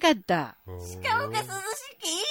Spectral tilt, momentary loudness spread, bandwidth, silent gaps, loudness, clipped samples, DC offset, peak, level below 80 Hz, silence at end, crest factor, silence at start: -3 dB/octave; 12 LU; 16.5 kHz; none; -29 LUFS; under 0.1%; under 0.1%; -8 dBFS; -64 dBFS; 0 s; 20 dB; 0 s